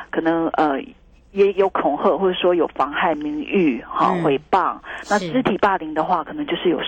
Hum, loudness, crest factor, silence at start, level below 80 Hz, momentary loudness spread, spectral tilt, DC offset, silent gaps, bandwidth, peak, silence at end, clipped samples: none; -20 LUFS; 14 dB; 0 s; -52 dBFS; 5 LU; -6 dB/octave; under 0.1%; none; 9 kHz; -4 dBFS; 0 s; under 0.1%